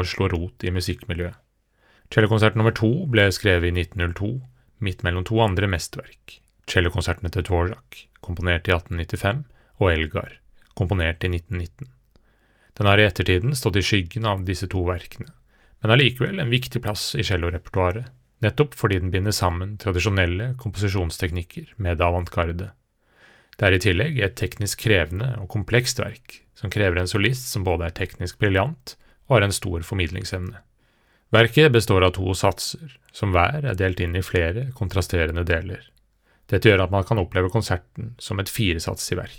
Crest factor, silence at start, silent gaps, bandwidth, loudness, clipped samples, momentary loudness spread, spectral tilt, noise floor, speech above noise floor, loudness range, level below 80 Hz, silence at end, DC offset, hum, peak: 22 dB; 0 s; none; 17.5 kHz; -22 LUFS; under 0.1%; 13 LU; -5.5 dB/octave; -62 dBFS; 40 dB; 4 LU; -44 dBFS; 0 s; under 0.1%; none; 0 dBFS